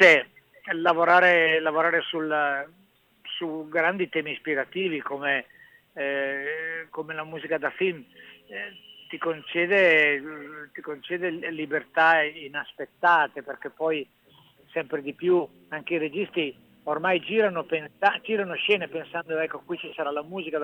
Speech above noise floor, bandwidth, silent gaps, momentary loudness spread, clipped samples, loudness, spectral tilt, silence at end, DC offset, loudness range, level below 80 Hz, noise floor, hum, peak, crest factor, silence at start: 32 dB; 19 kHz; none; 17 LU; under 0.1%; -25 LUFS; -5 dB/octave; 0 s; under 0.1%; 7 LU; -76 dBFS; -58 dBFS; none; -4 dBFS; 22 dB; 0 s